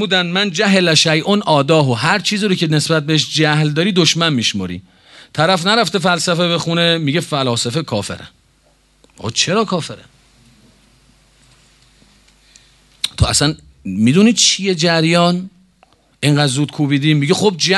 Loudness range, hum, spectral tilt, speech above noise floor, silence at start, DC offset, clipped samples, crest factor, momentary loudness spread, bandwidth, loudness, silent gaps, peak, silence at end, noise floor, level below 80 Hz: 9 LU; none; -4 dB/octave; 40 dB; 0 s; under 0.1%; under 0.1%; 16 dB; 11 LU; 12.5 kHz; -14 LUFS; none; 0 dBFS; 0 s; -55 dBFS; -40 dBFS